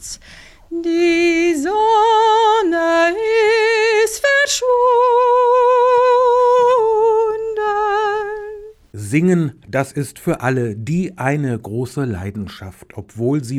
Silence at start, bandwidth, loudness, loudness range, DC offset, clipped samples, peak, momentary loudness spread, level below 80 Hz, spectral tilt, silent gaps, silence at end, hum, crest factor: 0 s; 14 kHz; -15 LUFS; 8 LU; under 0.1%; under 0.1%; -4 dBFS; 15 LU; -50 dBFS; -5 dB/octave; none; 0 s; none; 12 dB